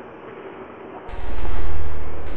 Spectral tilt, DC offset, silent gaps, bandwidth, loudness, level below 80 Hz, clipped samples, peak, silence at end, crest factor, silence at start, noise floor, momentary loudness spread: -8 dB/octave; under 0.1%; none; 7.6 kHz; -34 LUFS; -32 dBFS; under 0.1%; -4 dBFS; 0 s; 8 dB; 0 s; -38 dBFS; 7 LU